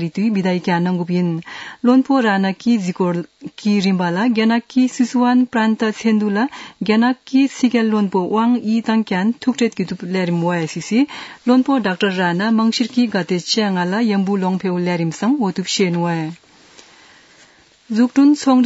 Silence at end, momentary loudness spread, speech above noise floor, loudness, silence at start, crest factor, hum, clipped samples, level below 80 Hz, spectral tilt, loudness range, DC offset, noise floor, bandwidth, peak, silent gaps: 0 s; 6 LU; 33 dB; -17 LUFS; 0 s; 16 dB; none; under 0.1%; -66 dBFS; -6 dB/octave; 2 LU; under 0.1%; -50 dBFS; 8 kHz; -2 dBFS; none